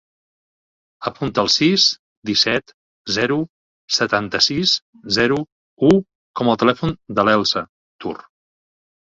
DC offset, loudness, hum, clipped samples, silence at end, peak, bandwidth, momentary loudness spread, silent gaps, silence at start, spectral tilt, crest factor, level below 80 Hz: under 0.1%; -18 LUFS; none; under 0.1%; 0.85 s; 0 dBFS; 7.8 kHz; 15 LU; 1.99-2.22 s, 2.74-3.05 s, 3.49-3.88 s, 4.82-4.93 s, 5.52-5.77 s, 6.15-6.34 s, 7.69-7.99 s; 1 s; -4 dB/octave; 20 dB; -52 dBFS